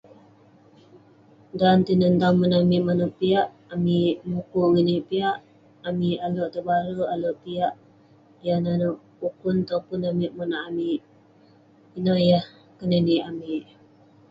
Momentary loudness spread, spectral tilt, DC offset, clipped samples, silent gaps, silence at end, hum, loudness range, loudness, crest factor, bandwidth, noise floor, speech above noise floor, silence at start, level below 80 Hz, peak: 12 LU; -9 dB/octave; under 0.1%; under 0.1%; none; 0.7 s; none; 6 LU; -24 LUFS; 18 dB; 5.4 kHz; -55 dBFS; 33 dB; 1.55 s; -62 dBFS; -6 dBFS